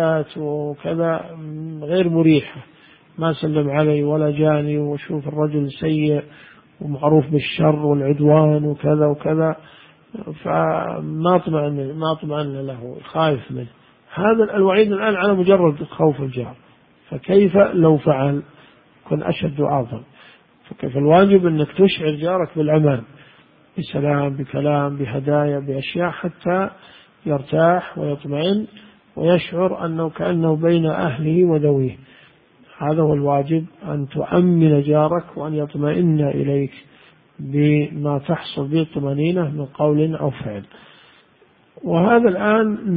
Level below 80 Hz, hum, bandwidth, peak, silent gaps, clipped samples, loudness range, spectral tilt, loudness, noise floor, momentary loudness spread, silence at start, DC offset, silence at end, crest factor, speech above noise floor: -52 dBFS; none; 4.9 kHz; 0 dBFS; none; under 0.1%; 4 LU; -12.5 dB/octave; -19 LUFS; -55 dBFS; 13 LU; 0 s; under 0.1%; 0 s; 18 dB; 37 dB